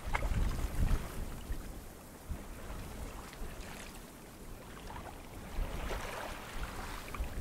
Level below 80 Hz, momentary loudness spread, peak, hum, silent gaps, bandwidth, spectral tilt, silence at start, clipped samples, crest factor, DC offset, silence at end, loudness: -40 dBFS; 13 LU; -14 dBFS; none; none; 16 kHz; -5 dB/octave; 0 s; under 0.1%; 26 dB; under 0.1%; 0 s; -43 LUFS